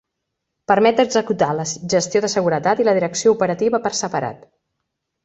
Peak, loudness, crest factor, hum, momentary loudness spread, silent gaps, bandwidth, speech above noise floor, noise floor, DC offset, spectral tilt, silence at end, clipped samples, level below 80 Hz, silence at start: -2 dBFS; -18 LUFS; 18 dB; none; 9 LU; none; 8.2 kHz; 60 dB; -78 dBFS; under 0.1%; -4 dB/octave; 0.9 s; under 0.1%; -60 dBFS; 0.7 s